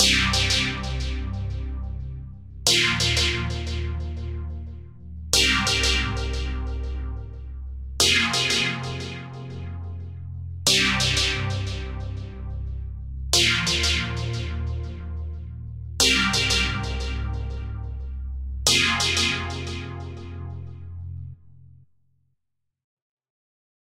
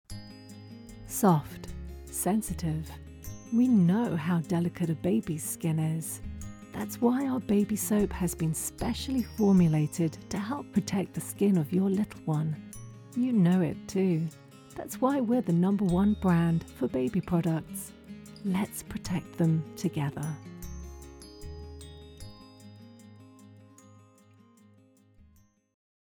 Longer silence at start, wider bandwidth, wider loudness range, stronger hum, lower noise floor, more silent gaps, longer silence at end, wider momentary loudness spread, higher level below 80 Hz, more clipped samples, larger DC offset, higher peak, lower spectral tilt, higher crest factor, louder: about the same, 0 s vs 0.1 s; second, 16 kHz vs 19 kHz; second, 2 LU vs 7 LU; neither; first, -80 dBFS vs -62 dBFS; neither; second, 2.35 s vs 2.5 s; about the same, 19 LU vs 20 LU; first, -34 dBFS vs -52 dBFS; neither; neither; first, -2 dBFS vs -12 dBFS; second, -2.5 dB/octave vs -6.5 dB/octave; first, 24 dB vs 16 dB; first, -22 LUFS vs -29 LUFS